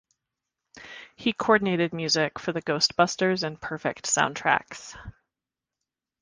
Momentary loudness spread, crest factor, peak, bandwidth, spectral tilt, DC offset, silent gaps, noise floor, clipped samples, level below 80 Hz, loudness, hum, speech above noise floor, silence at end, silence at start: 20 LU; 24 dB; -4 dBFS; 10 kHz; -3 dB/octave; under 0.1%; none; -89 dBFS; under 0.1%; -60 dBFS; -25 LUFS; none; 63 dB; 1.1 s; 0.75 s